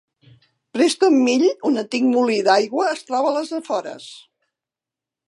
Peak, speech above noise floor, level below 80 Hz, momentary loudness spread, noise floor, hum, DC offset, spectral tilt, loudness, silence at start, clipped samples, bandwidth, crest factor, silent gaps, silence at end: -2 dBFS; 70 dB; -78 dBFS; 13 LU; -88 dBFS; none; under 0.1%; -3.5 dB/octave; -19 LUFS; 0.75 s; under 0.1%; 11.5 kHz; 20 dB; none; 1.1 s